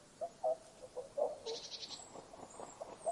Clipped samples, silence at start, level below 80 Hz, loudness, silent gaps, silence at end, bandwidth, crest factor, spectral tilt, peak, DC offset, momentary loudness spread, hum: under 0.1%; 0 s; -76 dBFS; -44 LUFS; none; 0 s; 11.5 kHz; 20 dB; -2.5 dB/octave; -24 dBFS; under 0.1%; 12 LU; none